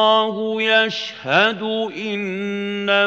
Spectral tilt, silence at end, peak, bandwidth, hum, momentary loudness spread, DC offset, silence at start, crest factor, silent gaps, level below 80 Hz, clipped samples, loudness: -4.5 dB/octave; 0 s; -2 dBFS; 8 kHz; none; 8 LU; under 0.1%; 0 s; 18 dB; none; -76 dBFS; under 0.1%; -19 LUFS